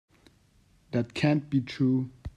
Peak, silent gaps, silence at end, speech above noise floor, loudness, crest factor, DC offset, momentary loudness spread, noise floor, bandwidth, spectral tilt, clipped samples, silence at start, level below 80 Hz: -10 dBFS; none; 0.1 s; 36 dB; -28 LUFS; 20 dB; under 0.1%; 6 LU; -63 dBFS; 10 kHz; -7.5 dB/octave; under 0.1%; 0.9 s; -54 dBFS